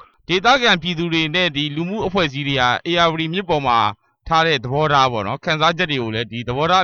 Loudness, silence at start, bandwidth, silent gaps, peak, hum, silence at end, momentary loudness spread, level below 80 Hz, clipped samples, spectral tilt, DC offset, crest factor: -18 LUFS; 0.3 s; 7.2 kHz; none; -4 dBFS; none; 0 s; 7 LU; -46 dBFS; under 0.1%; -5 dB/octave; under 0.1%; 14 dB